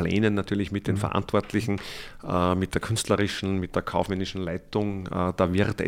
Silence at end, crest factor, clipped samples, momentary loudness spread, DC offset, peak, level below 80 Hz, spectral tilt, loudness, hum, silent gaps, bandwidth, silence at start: 0 s; 18 dB; under 0.1%; 6 LU; under 0.1%; -8 dBFS; -46 dBFS; -6 dB/octave; -27 LUFS; none; none; 16 kHz; 0 s